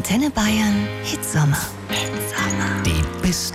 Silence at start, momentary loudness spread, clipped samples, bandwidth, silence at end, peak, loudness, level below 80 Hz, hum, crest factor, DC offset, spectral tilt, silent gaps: 0 s; 5 LU; under 0.1%; 16.5 kHz; 0 s; -8 dBFS; -21 LUFS; -34 dBFS; none; 12 dB; under 0.1%; -4.5 dB/octave; none